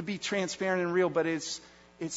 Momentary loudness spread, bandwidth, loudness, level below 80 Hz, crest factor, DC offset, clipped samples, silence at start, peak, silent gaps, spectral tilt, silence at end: 11 LU; 8 kHz; -30 LUFS; -70 dBFS; 16 dB; under 0.1%; under 0.1%; 0 s; -16 dBFS; none; -4 dB/octave; 0 s